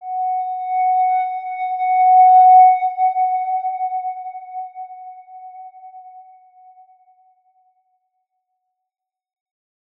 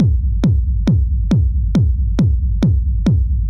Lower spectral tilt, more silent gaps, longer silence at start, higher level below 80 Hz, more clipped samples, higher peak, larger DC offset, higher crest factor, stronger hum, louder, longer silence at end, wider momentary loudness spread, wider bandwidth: second, -2 dB/octave vs -9 dB/octave; neither; about the same, 0 s vs 0 s; second, under -90 dBFS vs -16 dBFS; neither; about the same, -4 dBFS vs -4 dBFS; neither; first, 16 dB vs 10 dB; neither; about the same, -15 LUFS vs -16 LUFS; first, 3.75 s vs 0 s; first, 25 LU vs 1 LU; second, 3.9 kHz vs 6.8 kHz